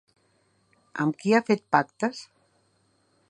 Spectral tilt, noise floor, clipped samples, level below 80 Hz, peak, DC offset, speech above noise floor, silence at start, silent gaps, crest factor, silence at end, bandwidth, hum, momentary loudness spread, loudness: -6 dB/octave; -68 dBFS; under 0.1%; -76 dBFS; -4 dBFS; under 0.1%; 43 dB; 0.95 s; none; 24 dB; 1.05 s; 10.5 kHz; none; 13 LU; -25 LUFS